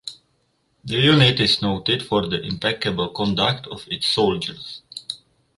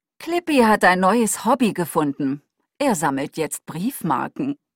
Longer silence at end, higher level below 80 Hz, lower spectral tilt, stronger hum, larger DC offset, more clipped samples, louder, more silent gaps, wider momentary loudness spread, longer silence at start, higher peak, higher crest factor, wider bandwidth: first, 0.4 s vs 0.2 s; first, -50 dBFS vs -58 dBFS; about the same, -5.5 dB/octave vs -4.5 dB/octave; neither; neither; neither; about the same, -20 LUFS vs -20 LUFS; neither; first, 19 LU vs 11 LU; second, 0.05 s vs 0.2 s; about the same, -2 dBFS vs -2 dBFS; about the same, 20 dB vs 18 dB; second, 11.5 kHz vs 16.5 kHz